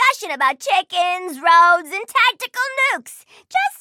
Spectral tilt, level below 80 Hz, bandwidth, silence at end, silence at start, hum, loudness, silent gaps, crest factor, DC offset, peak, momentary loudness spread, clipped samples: 1 dB/octave; -86 dBFS; 17 kHz; 0.05 s; 0 s; none; -17 LUFS; none; 14 dB; under 0.1%; -2 dBFS; 10 LU; under 0.1%